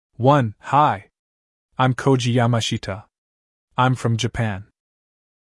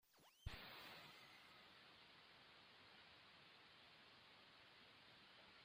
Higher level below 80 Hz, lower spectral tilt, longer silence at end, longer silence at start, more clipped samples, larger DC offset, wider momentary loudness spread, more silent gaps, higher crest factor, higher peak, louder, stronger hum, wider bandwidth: first, -50 dBFS vs -70 dBFS; first, -6 dB/octave vs -3.5 dB/octave; first, 0.85 s vs 0 s; first, 0.2 s vs 0.05 s; neither; neither; first, 13 LU vs 8 LU; first, 1.19-1.69 s, 3.18-3.68 s vs none; second, 18 dB vs 28 dB; first, -4 dBFS vs -36 dBFS; first, -20 LUFS vs -63 LUFS; neither; second, 11.5 kHz vs 16 kHz